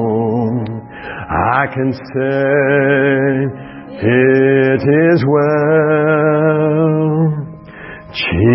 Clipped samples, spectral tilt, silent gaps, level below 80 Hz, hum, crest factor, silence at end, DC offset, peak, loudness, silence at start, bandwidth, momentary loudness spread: under 0.1%; -12 dB/octave; none; -42 dBFS; none; 14 dB; 0 s; under 0.1%; 0 dBFS; -13 LUFS; 0 s; 5.8 kHz; 16 LU